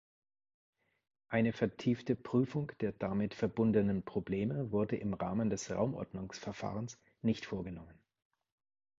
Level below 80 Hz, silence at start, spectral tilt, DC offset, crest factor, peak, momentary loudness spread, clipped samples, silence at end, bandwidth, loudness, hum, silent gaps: -62 dBFS; 1.3 s; -7 dB/octave; under 0.1%; 20 dB; -18 dBFS; 10 LU; under 0.1%; 1.05 s; 7.8 kHz; -36 LUFS; none; none